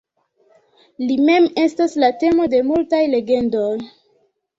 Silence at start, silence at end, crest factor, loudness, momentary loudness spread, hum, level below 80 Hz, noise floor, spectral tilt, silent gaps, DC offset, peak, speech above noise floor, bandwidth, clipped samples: 1 s; 0.7 s; 14 dB; -17 LUFS; 9 LU; none; -56 dBFS; -62 dBFS; -5.5 dB/octave; none; under 0.1%; -4 dBFS; 46 dB; 7.8 kHz; under 0.1%